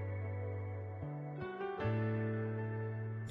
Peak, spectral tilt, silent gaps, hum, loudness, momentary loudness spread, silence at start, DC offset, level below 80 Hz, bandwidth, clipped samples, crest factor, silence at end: -24 dBFS; -8 dB/octave; none; none; -40 LUFS; 7 LU; 0 s; under 0.1%; -66 dBFS; 4.5 kHz; under 0.1%; 14 dB; 0 s